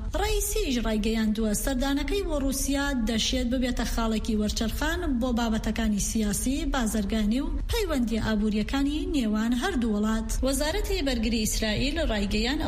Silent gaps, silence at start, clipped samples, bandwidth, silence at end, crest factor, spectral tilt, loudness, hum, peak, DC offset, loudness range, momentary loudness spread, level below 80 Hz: none; 0 s; under 0.1%; 15.5 kHz; 0 s; 12 dB; -4 dB/octave; -27 LUFS; none; -14 dBFS; under 0.1%; 0 LU; 2 LU; -32 dBFS